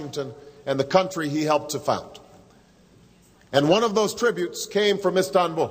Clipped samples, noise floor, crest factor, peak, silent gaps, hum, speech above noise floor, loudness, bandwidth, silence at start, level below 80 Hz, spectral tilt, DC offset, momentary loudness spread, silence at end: under 0.1%; -54 dBFS; 20 dB; -4 dBFS; none; none; 32 dB; -23 LUFS; 16 kHz; 0 s; -62 dBFS; -4.5 dB/octave; under 0.1%; 12 LU; 0 s